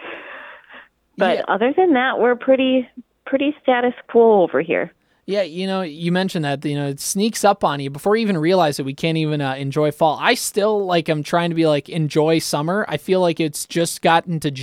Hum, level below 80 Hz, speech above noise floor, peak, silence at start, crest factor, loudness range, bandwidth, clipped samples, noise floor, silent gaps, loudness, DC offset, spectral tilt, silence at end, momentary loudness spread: none; -62 dBFS; 27 dB; 0 dBFS; 0 s; 18 dB; 3 LU; 16.5 kHz; under 0.1%; -45 dBFS; none; -19 LUFS; under 0.1%; -5 dB/octave; 0 s; 7 LU